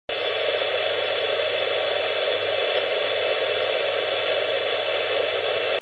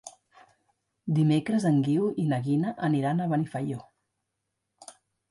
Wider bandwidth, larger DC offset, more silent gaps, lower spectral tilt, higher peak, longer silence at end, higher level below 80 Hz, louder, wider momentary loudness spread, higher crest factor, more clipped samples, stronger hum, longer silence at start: second, 8.4 kHz vs 11.5 kHz; neither; neither; second, -3.5 dB/octave vs -7.5 dB/octave; first, -10 dBFS vs -14 dBFS; second, 0 s vs 0.4 s; about the same, -68 dBFS vs -70 dBFS; first, -23 LUFS vs -27 LUFS; second, 1 LU vs 11 LU; about the same, 14 dB vs 14 dB; neither; neither; about the same, 0.1 s vs 0.05 s